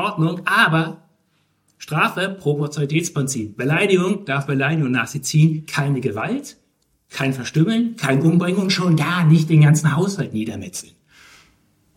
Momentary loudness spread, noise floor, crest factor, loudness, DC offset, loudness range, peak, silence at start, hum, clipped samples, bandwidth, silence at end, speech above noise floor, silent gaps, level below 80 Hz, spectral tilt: 11 LU; -65 dBFS; 18 dB; -19 LUFS; under 0.1%; 4 LU; 0 dBFS; 0 s; none; under 0.1%; 15.5 kHz; 1.15 s; 46 dB; none; -62 dBFS; -5.5 dB/octave